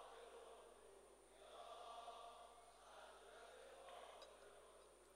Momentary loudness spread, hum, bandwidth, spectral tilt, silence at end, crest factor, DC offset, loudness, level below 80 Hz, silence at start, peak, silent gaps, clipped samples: 9 LU; none; 15.5 kHz; -1.5 dB/octave; 0 s; 16 dB; under 0.1%; -62 LUFS; -82 dBFS; 0 s; -46 dBFS; none; under 0.1%